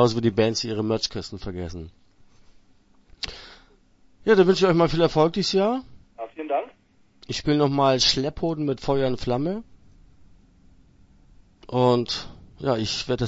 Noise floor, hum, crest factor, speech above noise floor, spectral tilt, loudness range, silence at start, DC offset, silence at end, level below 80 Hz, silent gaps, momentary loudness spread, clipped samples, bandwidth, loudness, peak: -57 dBFS; none; 20 dB; 35 dB; -5 dB/octave; 8 LU; 0 s; under 0.1%; 0 s; -48 dBFS; none; 16 LU; under 0.1%; 8 kHz; -23 LUFS; -4 dBFS